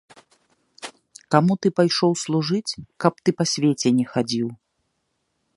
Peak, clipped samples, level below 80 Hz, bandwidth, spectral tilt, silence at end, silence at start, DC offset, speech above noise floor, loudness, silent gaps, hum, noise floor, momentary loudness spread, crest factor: 0 dBFS; under 0.1%; -64 dBFS; 11.5 kHz; -5 dB/octave; 1 s; 0.8 s; under 0.1%; 53 dB; -21 LUFS; none; none; -73 dBFS; 14 LU; 22 dB